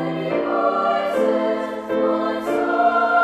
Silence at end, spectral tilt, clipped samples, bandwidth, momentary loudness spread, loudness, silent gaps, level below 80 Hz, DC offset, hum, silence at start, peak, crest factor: 0 s; -6.5 dB/octave; under 0.1%; 14 kHz; 5 LU; -20 LUFS; none; -60 dBFS; under 0.1%; none; 0 s; -6 dBFS; 14 dB